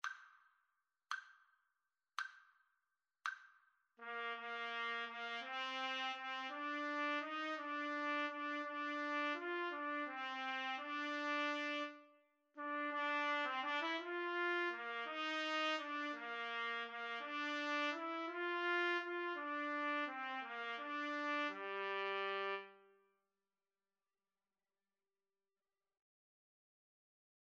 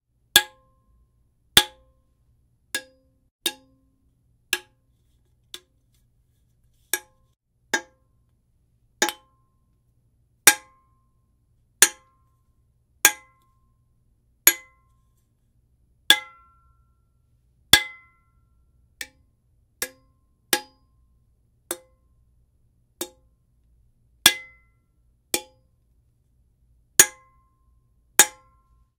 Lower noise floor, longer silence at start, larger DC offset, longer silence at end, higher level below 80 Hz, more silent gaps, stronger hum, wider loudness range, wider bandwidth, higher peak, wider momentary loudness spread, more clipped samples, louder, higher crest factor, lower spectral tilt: first, under -90 dBFS vs -65 dBFS; second, 0.05 s vs 0.35 s; neither; first, 4.65 s vs 0.7 s; second, under -90 dBFS vs -58 dBFS; second, none vs 3.31-3.39 s; neither; second, 8 LU vs 12 LU; second, 9 kHz vs 16 kHz; second, -26 dBFS vs 0 dBFS; second, 9 LU vs 19 LU; neither; second, -42 LUFS vs -21 LUFS; second, 20 dB vs 28 dB; first, -1.5 dB/octave vs 1 dB/octave